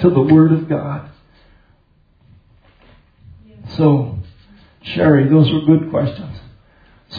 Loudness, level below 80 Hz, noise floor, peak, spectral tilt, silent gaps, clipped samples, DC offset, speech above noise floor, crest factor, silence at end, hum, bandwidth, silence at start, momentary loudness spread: -14 LUFS; -48 dBFS; -55 dBFS; 0 dBFS; -10.5 dB/octave; none; under 0.1%; under 0.1%; 42 dB; 16 dB; 0 s; none; 5 kHz; 0 s; 21 LU